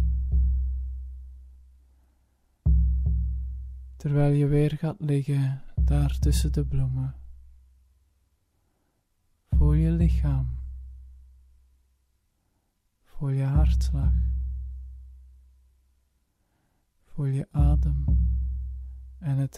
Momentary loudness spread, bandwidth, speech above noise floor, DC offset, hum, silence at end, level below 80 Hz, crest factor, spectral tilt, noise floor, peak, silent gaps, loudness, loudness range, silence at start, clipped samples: 18 LU; 11.5 kHz; 49 dB; under 0.1%; none; 0 s; -28 dBFS; 16 dB; -8 dB/octave; -72 dBFS; -10 dBFS; none; -26 LUFS; 7 LU; 0 s; under 0.1%